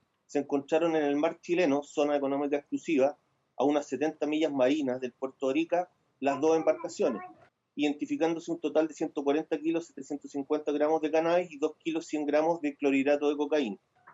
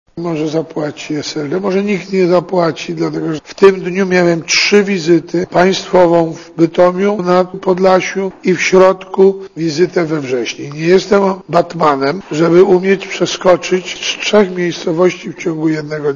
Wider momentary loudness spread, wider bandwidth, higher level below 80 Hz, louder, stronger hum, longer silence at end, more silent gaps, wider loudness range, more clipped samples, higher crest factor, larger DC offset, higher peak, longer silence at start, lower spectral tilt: about the same, 8 LU vs 9 LU; about the same, 8 kHz vs 7.4 kHz; second, -86 dBFS vs -50 dBFS; second, -30 LUFS vs -13 LUFS; neither; about the same, 0.05 s vs 0 s; neither; about the same, 2 LU vs 3 LU; second, under 0.1% vs 0.4%; about the same, 16 dB vs 12 dB; neither; second, -14 dBFS vs 0 dBFS; first, 0.3 s vs 0.15 s; about the same, -5 dB/octave vs -5 dB/octave